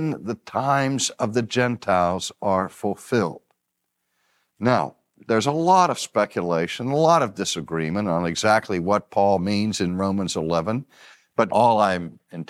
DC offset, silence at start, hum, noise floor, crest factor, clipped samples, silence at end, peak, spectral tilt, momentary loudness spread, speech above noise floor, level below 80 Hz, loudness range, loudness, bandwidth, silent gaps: under 0.1%; 0 s; none; -78 dBFS; 18 dB; under 0.1%; 0.05 s; -4 dBFS; -5 dB/octave; 9 LU; 56 dB; -58 dBFS; 4 LU; -22 LUFS; 14.5 kHz; none